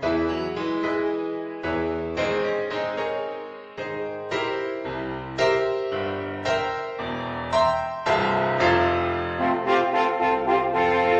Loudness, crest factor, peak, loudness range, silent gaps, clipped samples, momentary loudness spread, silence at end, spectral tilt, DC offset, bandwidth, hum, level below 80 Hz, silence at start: -24 LUFS; 16 dB; -8 dBFS; 6 LU; none; under 0.1%; 9 LU; 0 s; -5.5 dB/octave; under 0.1%; 9.4 kHz; none; -50 dBFS; 0 s